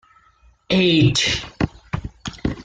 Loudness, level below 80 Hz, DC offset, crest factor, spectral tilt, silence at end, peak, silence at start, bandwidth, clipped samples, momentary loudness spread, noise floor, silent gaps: -19 LUFS; -40 dBFS; under 0.1%; 16 dB; -4.5 dB/octave; 0 s; -4 dBFS; 0.7 s; 9.4 kHz; under 0.1%; 16 LU; -55 dBFS; none